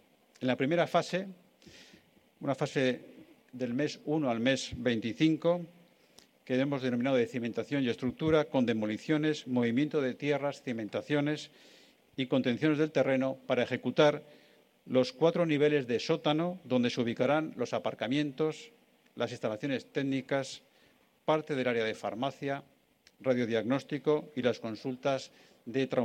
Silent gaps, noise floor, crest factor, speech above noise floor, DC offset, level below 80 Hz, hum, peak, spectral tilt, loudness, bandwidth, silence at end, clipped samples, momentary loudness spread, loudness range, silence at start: none; -66 dBFS; 20 dB; 35 dB; under 0.1%; -68 dBFS; none; -10 dBFS; -6 dB/octave; -31 LUFS; 10 kHz; 0 s; under 0.1%; 10 LU; 5 LU; 0.4 s